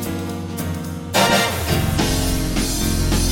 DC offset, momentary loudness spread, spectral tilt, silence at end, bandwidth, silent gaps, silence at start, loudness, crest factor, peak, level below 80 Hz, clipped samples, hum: under 0.1%; 10 LU; -4 dB/octave; 0 s; 17 kHz; none; 0 s; -20 LUFS; 16 dB; -2 dBFS; -28 dBFS; under 0.1%; none